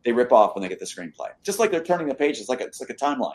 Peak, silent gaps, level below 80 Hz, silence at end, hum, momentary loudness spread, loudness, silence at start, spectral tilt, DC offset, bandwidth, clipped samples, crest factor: -2 dBFS; none; -68 dBFS; 0 s; none; 15 LU; -23 LUFS; 0.05 s; -4 dB/octave; under 0.1%; 13 kHz; under 0.1%; 22 dB